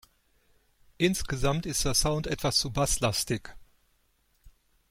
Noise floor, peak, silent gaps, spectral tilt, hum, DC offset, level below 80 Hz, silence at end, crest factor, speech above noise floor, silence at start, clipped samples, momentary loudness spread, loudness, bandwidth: -69 dBFS; -10 dBFS; none; -3.5 dB/octave; none; under 0.1%; -42 dBFS; 0.4 s; 20 dB; 42 dB; 1 s; under 0.1%; 4 LU; -28 LUFS; 16.5 kHz